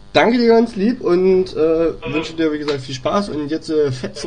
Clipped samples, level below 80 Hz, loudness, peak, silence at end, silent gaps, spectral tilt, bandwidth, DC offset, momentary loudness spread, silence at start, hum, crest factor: under 0.1%; -44 dBFS; -17 LUFS; 0 dBFS; 0 s; none; -6 dB/octave; 10 kHz; 0.9%; 9 LU; 0.15 s; none; 16 dB